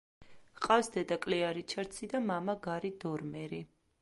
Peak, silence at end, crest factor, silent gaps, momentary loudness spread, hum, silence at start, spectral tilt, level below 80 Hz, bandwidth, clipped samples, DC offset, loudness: -14 dBFS; 0.35 s; 22 dB; none; 12 LU; none; 0.2 s; -5 dB/octave; -68 dBFS; 11.5 kHz; under 0.1%; under 0.1%; -35 LUFS